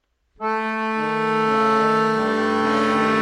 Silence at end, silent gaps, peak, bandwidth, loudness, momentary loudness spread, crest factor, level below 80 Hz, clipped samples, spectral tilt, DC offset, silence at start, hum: 0 s; none; -8 dBFS; 11.5 kHz; -20 LUFS; 6 LU; 12 dB; -62 dBFS; under 0.1%; -5.5 dB/octave; under 0.1%; 0.4 s; none